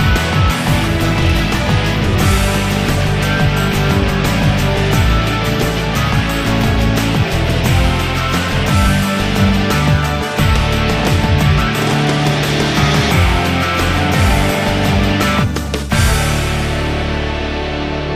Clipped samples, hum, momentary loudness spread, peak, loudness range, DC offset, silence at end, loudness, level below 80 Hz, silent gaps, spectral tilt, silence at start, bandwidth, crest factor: under 0.1%; none; 4 LU; 0 dBFS; 1 LU; under 0.1%; 0 s; -14 LUFS; -22 dBFS; none; -5 dB/octave; 0 s; 15.5 kHz; 12 dB